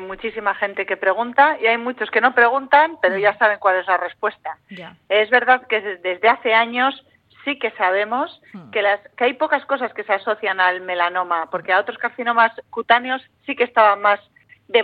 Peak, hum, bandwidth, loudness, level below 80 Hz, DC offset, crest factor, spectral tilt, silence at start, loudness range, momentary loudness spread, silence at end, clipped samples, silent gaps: -2 dBFS; none; 5 kHz; -18 LUFS; -64 dBFS; under 0.1%; 18 dB; -6 dB/octave; 0 s; 4 LU; 11 LU; 0 s; under 0.1%; none